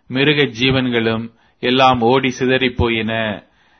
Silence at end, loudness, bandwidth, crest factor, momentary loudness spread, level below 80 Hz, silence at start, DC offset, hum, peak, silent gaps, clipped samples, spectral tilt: 0.4 s; -16 LUFS; 6.6 kHz; 16 dB; 11 LU; -40 dBFS; 0.1 s; under 0.1%; none; 0 dBFS; none; under 0.1%; -5.5 dB/octave